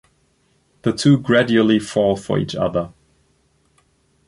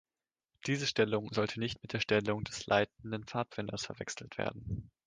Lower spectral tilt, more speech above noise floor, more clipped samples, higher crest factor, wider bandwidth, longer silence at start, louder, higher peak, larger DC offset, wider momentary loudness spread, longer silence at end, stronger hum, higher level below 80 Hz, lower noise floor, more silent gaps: first, -6 dB/octave vs -4.5 dB/octave; second, 45 dB vs over 55 dB; neither; about the same, 18 dB vs 22 dB; first, 11.5 kHz vs 10 kHz; first, 0.85 s vs 0.65 s; first, -18 LUFS vs -35 LUFS; first, -2 dBFS vs -12 dBFS; neither; about the same, 10 LU vs 10 LU; first, 1.4 s vs 0.2 s; neither; first, -50 dBFS vs -60 dBFS; second, -62 dBFS vs under -90 dBFS; neither